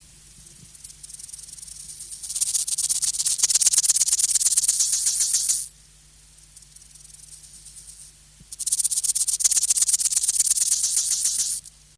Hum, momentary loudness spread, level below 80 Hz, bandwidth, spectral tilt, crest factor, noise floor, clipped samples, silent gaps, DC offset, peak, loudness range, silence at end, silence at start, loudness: none; 19 LU; -58 dBFS; 11 kHz; 3 dB/octave; 24 dB; -52 dBFS; under 0.1%; none; under 0.1%; -2 dBFS; 9 LU; 0.3 s; 0.4 s; -19 LUFS